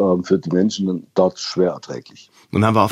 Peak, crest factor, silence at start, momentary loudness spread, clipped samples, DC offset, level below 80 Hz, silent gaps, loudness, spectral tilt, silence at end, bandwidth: -2 dBFS; 18 dB; 0 s; 12 LU; under 0.1%; under 0.1%; -62 dBFS; none; -19 LUFS; -6.5 dB/octave; 0 s; 13 kHz